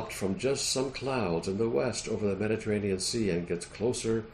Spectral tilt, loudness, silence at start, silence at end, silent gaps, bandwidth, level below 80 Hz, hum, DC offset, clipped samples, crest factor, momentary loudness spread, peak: -4.5 dB/octave; -30 LUFS; 0 s; 0 s; none; 14 kHz; -54 dBFS; none; under 0.1%; under 0.1%; 14 dB; 3 LU; -16 dBFS